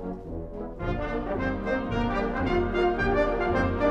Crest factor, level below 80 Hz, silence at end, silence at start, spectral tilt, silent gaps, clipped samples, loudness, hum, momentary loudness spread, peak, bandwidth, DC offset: 14 dB; -36 dBFS; 0 s; 0 s; -8 dB/octave; none; under 0.1%; -27 LUFS; none; 11 LU; -12 dBFS; 8.2 kHz; under 0.1%